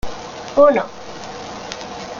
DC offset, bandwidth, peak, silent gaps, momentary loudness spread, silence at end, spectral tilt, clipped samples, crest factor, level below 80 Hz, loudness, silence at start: under 0.1%; 7.4 kHz; 0 dBFS; none; 18 LU; 0 s; -4.5 dB/octave; under 0.1%; 18 dB; -44 dBFS; -16 LUFS; 0.05 s